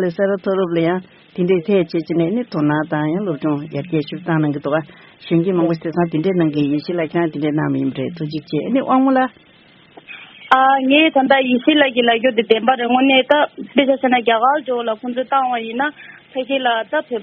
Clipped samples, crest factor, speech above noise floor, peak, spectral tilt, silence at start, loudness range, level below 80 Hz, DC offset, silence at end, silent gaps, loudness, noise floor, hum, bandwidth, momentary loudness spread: under 0.1%; 18 dB; 30 dB; 0 dBFS; -4 dB/octave; 0 s; 6 LU; -62 dBFS; under 0.1%; 0 s; none; -17 LUFS; -46 dBFS; none; 5.8 kHz; 10 LU